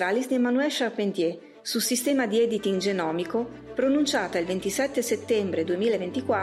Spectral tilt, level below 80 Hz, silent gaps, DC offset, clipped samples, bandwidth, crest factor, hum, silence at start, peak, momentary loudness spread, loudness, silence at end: -4 dB/octave; -64 dBFS; none; under 0.1%; under 0.1%; 16 kHz; 12 dB; none; 0 s; -14 dBFS; 5 LU; -26 LUFS; 0 s